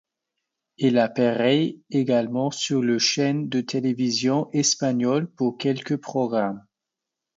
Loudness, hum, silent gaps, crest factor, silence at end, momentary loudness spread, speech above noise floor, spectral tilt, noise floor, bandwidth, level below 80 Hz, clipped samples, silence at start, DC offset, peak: -23 LUFS; none; none; 16 dB; 0.8 s; 6 LU; 63 dB; -4.5 dB/octave; -86 dBFS; 7.8 kHz; -70 dBFS; under 0.1%; 0.8 s; under 0.1%; -6 dBFS